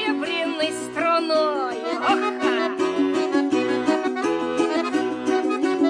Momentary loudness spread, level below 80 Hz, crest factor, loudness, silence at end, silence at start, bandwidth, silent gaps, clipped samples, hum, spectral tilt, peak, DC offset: 3 LU; -66 dBFS; 16 dB; -22 LUFS; 0 s; 0 s; 10.5 kHz; none; under 0.1%; none; -3.5 dB/octave; -6 dBFS; under 0.1%